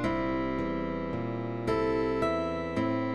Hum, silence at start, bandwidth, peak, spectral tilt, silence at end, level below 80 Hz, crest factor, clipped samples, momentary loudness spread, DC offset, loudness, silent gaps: none; 0 s; 11 kHz; -16 dBFS; -7.5 dB/octave; 0 s; -48 dBFS; 12 dB; under 0.1%; 5 LU; 0.3%; -31 LUFS; none